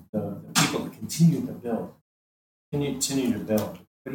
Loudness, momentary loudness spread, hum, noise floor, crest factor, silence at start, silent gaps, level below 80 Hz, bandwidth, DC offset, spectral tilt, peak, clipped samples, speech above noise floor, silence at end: -26 LUFS; 12 LU; none; under -90 dBFS; 20 dB; 0 s; 0.09-0.13 s, 2.01-2.72 s, 3.87-4.05 s; -60 dBFS; over 20 kHz; under 0.1%; -4.5 dB/octave; -6 dBFS; under 0.1%; over 64 dB; 0 s